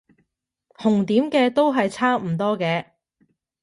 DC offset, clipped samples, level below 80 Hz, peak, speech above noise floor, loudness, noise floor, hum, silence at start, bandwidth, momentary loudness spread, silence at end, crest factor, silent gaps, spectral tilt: under 0.1%; under 0.1%; -66 dBFS; -6 dBFS; 52 dB; -21 LUFS; -72 dBFS; none; 0.8 s; 11.5 kHz; 6 LU; 0.8 s; 16 dB; none; -6.5 dB/octave